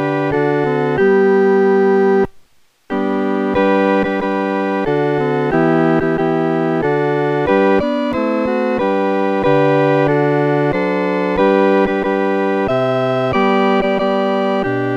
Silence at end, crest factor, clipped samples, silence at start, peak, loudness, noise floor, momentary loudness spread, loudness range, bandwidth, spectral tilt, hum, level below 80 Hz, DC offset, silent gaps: 0 s; 14 dB; under 0.1%; 0 s; 0 dBFS; -15 LUFS; -50 dBFS; 5 LU; 1 LU; 7.2 kHz; -8 dB/octave; none; -46 dBFS; under 0.1%; none